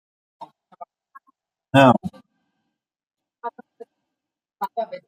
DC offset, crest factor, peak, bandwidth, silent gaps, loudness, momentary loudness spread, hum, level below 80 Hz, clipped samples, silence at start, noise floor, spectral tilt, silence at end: under 0.1%; 24 dB; -2 dBFS; 15.5 kHz; none; -19 LUFS; 21 LU; none; -66 dBFS; under 0.1%; 0.4 s; -85 dBFS; -7 dB/octave; 0.1 s